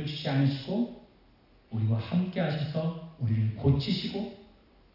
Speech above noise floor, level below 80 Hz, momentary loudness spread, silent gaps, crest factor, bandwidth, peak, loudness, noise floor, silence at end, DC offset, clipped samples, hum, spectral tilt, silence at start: 32 dB; -54 dBFS; 8 LU; none; 16 dB; 5.8 kHz; -14 dBFS; -30 LUFS; -60 dBFS; 0.5 s; under 0.1%; under 0.1%; none; -8.5 dB/octave; 0 s